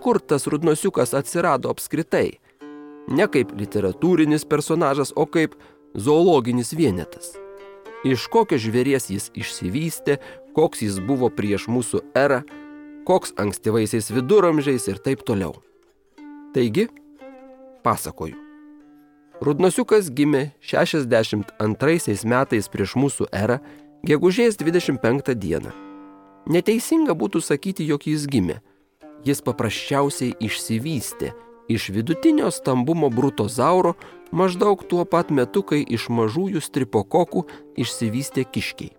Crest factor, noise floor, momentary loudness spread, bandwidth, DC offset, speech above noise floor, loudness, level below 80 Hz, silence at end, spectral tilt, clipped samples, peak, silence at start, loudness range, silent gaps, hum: 18 dB; -58 dBFS; 10 LU; 19 kHz; under 0.1%; 37 dB; -21 LUFS; -56 dBFS; 0.1 s; -5.5 dB/octave; under 0.1%; -4 dBFS; 0 s; 4 LU; none; none